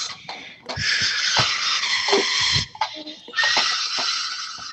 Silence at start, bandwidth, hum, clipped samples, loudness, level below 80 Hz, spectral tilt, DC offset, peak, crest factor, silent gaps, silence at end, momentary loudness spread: 0 s; 8.8 kHz; none; under 0.1%; -20 LUFS; -52 dBFS; -1 dB/octave; under 0.1%; -4 dBFS; 18 dB; none; 0 s; 14 LU